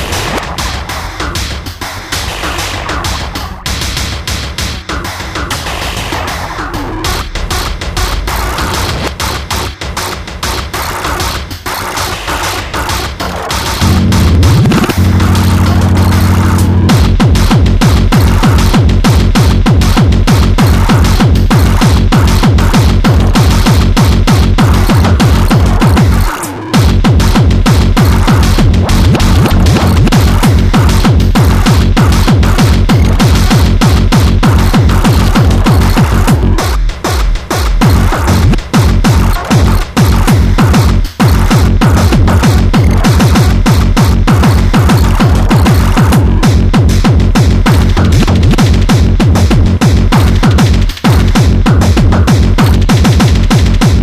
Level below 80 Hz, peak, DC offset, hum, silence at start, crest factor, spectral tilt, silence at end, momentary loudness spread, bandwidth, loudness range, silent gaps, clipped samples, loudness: -12 dBFS; 0 dBFS; under 0.1%; none; 0 s; 8 dB; -5.5 dB/octave; 0 s; 8 LU; 15.5 kHz; 8 LU; none; under 0.1%; -9 LUFS